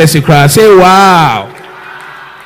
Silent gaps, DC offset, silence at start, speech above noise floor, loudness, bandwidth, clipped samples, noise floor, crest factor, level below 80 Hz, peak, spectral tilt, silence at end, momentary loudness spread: none; under 0.1%; 0 s; 24 dB; -4 LUFS; 19 kHz; 10%; -28 dBFS; 6 dB; -38 dBFS; 0 dBFS; -5 dB/octave; 0.2 s; 23 LU